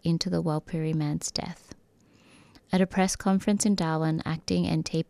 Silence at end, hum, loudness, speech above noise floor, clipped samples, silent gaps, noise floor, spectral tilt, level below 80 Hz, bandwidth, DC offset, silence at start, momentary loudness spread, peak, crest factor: 0.05 s; none; -27 LUFS; 33 dB; under 0.1%; none; -60 dBFS; -5.5 dB/octave; -54 dBFS; 14 kHz; under 0.1%; 0.05 s; 6 LU; -10 dBFS; 18 dB